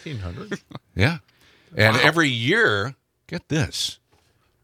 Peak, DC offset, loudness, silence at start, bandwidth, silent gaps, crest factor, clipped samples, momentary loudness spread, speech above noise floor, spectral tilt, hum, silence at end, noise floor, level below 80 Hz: 0 dBFS; under 0.1%; -20 LUFS; 0.05 s; 15.5 kHz; none; 22 dB; under 0.1%; 18 LU; 41 dB; -4.5 dB/octave; none; 0.7 s; -62 dBFS; -52 dBFS